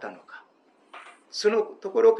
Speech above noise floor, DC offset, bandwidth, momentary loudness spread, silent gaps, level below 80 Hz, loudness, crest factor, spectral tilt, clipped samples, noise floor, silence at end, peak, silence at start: 38 dB; under 0.1%; 10.5 kHz; 24 LU; none; under -90 dBFS; -25 LUFS; 18 dB; -3.5 dB/octave; under 0.1%; -61 dBFS; 0 s; -8 dBFS; 0 s